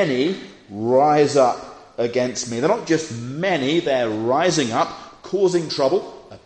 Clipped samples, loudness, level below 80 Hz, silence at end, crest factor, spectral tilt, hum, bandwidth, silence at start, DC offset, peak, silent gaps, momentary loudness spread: under 0.1%; -20 LUFS; -60 dBFS; 0.1 s; 16 dB; -4.5 dB/octave; none; 9.4 kHz; 0 s; under 0.1%; -4 dBFS; none; 13 LU